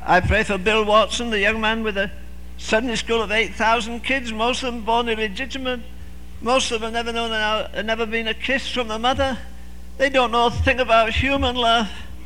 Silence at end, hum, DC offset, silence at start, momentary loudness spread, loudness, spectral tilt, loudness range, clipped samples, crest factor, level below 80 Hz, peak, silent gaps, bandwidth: 0 s; 60 Hz at -40 dBFS; 2%; 0 s; 11 LU; -20 LUFS; -4 dB/octave; 3 LU; under 0.1%; 18 dB; -36 dBFS; -4 dBFS; none; 16.5 kHz